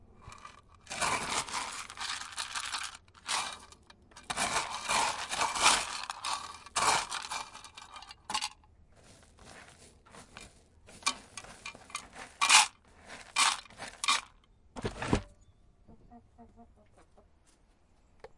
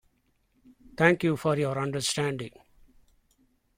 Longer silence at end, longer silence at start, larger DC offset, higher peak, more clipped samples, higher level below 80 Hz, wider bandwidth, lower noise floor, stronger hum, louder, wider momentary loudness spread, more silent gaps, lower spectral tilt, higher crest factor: second, 0.1 s vs 1.3 s; second, 0.2 s vs 0.85 s; neither; about the same, -6 dBFS vs -6 dBFS; neither; about the same, -58 dBFS vs -62 dBFS; second, 11.5 kHz vs 16 kHz; second, -65 dBFS vs -71 dBFS; neither; second, -31 LUFS vs -27 LUFS; first, 25 LU vs 16 LU; neither; second, -0.5 dB/octave vs -5 dB/octave; first, 30 dB vs 24 dB